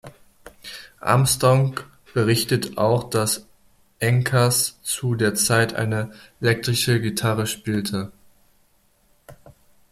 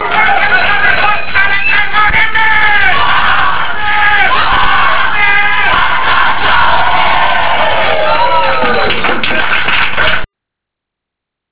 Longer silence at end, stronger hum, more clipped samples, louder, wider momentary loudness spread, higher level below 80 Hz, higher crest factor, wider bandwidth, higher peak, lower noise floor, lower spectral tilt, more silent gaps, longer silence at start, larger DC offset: first, 0.55 s vs 0 s; neither; second, under 0.1% vs 1%; second, -21 LUFS vs -9 LUFS; first, 12 LU vs 3 LU; second, -54 dBFS vs -32 dBFS; first, 20 dB vs 12 dB; first, 15.5 kHz vs 4 kHz; second, -4 dBFS vs 0 dBFS; second, -61 dBFS vs -79 dBFS; second, -4.5 dB/octave vs -6.5 dB/octave; neither; about the same, 0.05 s vs 0 s; second, under 0.1% vs 30%